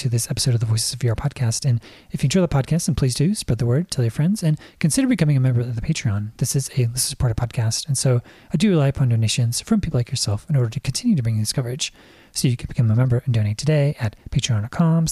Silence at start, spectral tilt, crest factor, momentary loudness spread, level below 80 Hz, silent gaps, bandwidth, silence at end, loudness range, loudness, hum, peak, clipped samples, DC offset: 0 s; -5.5 dB/octave; 14 dB; 5 LU; -40 dBFS; none; 14.5 kHz; 0 s; 2 LU; -21 LUFS; none; -6 dBFS; under 0.1%; under 0.1%